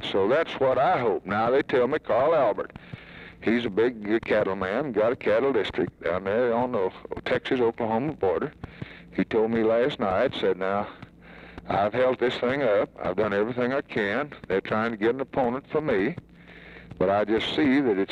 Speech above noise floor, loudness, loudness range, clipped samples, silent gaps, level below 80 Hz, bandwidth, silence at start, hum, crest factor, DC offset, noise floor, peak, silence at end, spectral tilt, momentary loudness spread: 22 dB; -25 LUFS; 2 LU; under 0.1%; none; -56 dBFS; 8.2 kHz; 0 s; none; 14 dB; under 0.1%; -47 dBFS; -12 dBFS; 0 s; -7 dB/octave; 12 LU